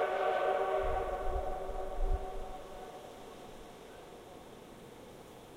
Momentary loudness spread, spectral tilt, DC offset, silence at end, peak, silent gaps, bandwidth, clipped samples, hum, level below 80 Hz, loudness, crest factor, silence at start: 20 LU; -5.5 dB/octave; under 0.1%; 0 s; -20 dBFS; none; 16 kHz; under 0.1%; none; -42 dBFS; -37 LUFS; 16 dB; 0 s